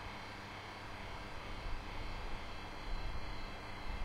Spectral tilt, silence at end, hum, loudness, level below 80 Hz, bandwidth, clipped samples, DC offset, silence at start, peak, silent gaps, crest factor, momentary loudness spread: -4.5 dB/octave; 0 s; none; -47 LUFS; -46 dBFS; 13.5 kHz; under 0.1%; under 0.1%; 0 s; -28 dBFS; none; 14 dB; 2 LU